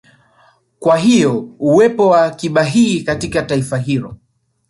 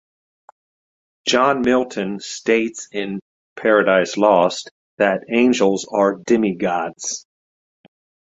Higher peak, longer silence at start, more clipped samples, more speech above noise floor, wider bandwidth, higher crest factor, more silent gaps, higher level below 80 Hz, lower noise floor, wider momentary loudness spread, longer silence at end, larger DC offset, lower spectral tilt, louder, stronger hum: about the same, -2 dBFS vs -2 dBFS; second, 0.8 s vs 1.25 s; neither; second, 40 dB vs over 72 dB; first, 11.5 kHz vs 8.2 kHz; about the same, 14 dB vs 18 dB; second, none vs 3.22-3.56 s, 4.71-4.98 s; first, -48 dBFS vs -60 dBFS; second, -53 dBFS vs under -90 dBFS; second, 8 LU vs 12 LU; second, 0.55 s vs 1.1 s; neither; first, -6 dB/octave vs -4 dB/octave; first, -14 LUFS vs -18 LUFS; neither